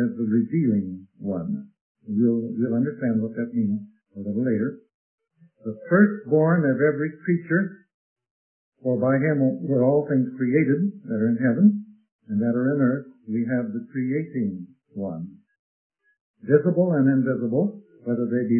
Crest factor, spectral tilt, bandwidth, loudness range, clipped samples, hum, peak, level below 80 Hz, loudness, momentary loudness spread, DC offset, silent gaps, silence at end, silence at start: 20 dB; -15.5 dB/octave; 2.6 kHz; 5 LU; under 0.1%; none; -4 dBFS; -72 dBFS; -23 LUFS; 13 LU; under 0.1%; 1.81-1.95 s, 4.94-5.18 s, 7.94-8.16 s, 8.31-8.72 s, 12.12-12.19 s, 15.59-15.90 s, 16.21-16.34 s; 0 s; 0 s